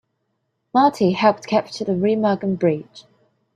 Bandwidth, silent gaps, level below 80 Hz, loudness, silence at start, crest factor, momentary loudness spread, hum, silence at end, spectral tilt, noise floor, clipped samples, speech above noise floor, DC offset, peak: 11 kHz; none; -64 dBFS; -19 LUFS; 0.75 s; 18 dB; 5 LU; none; 0.55 s; -6.5 dB/octave; -73 dBFS; under 0.1%; 54 dB; under 0.1%; -2 dBFS